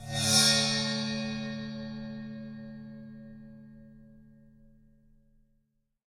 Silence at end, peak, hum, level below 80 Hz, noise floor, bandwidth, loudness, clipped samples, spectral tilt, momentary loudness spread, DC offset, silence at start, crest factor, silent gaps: 1.4 s; -10 dBFS; none; -60 dBFS; -75 dBFS; 16 kHz; -27 LUFS; under 0.1%; -2.5 dB/octave; 26 LU; under 0.1%; 0 s; 24 dB; none